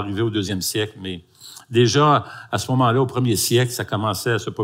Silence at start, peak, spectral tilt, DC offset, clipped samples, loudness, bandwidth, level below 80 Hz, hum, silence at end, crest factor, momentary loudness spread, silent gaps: 0 s; -4 dBFS; -5 dB/octave; under 0.1%; under 0.1%; -20 LUFS; 16 kHz; -60 dBFS; none; 0 s; 18 dB; 15 LU; none